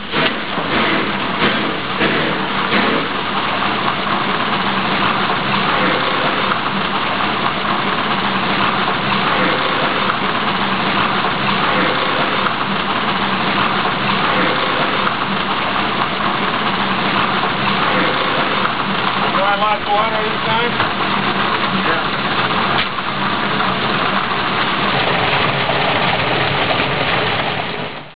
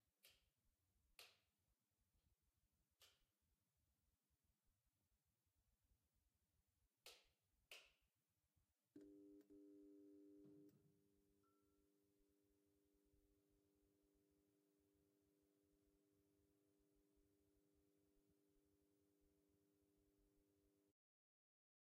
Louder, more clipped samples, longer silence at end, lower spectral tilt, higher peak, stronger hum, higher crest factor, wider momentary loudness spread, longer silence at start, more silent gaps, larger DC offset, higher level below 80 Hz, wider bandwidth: first, -16 LUFS vs -68 LUFS; neither; second, 0 s vs 1 s; first, -8 dB/octave vs -3 dB/octave; first, -2 dBFS vs -46 dBFS; neither; second, 16 dB vs 32 dB; about the same, 3 LU vs 4 LU; about the same, 0 s vs 0 s; neither; first, 3% vs under 0.1%; first, -44 dBFS vs under -90 dBFS; second, 4 kHz vs 5 kHz